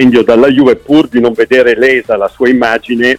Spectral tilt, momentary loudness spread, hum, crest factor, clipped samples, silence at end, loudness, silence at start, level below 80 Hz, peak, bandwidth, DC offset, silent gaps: -6 dB/octave; 4 LU; none; 8 dB; 0.6%; 0 s; -8 LUFS; 0 s; -44 dBFS; 0 dBFS; 12 kHz; under 0.1%; none